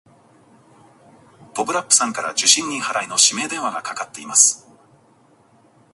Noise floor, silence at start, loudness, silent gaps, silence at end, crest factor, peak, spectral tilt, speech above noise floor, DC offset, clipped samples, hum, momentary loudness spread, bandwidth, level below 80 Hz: -55 dBFS; 1.4 s; -17 LUFS; none; 1.35 s; 22 dB; 0 dBFS; 0.5 dB/octave; 35 dB; under 0.1%; under 0.1%; none; 15 LU; 16 kHz; -72 dBFS